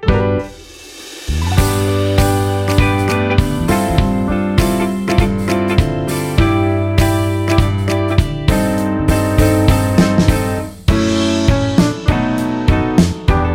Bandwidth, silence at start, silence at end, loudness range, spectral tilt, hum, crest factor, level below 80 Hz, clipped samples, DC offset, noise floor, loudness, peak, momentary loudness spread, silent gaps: 16.5 kHz; 0 s; 0 s; 1 LU; -6 dB/octave; none; 14 dB; -22 dBFS; under 0.1%; under 0.1%; -35 dBFS; -15 LUFS; 0 dBFS; 5 LU; none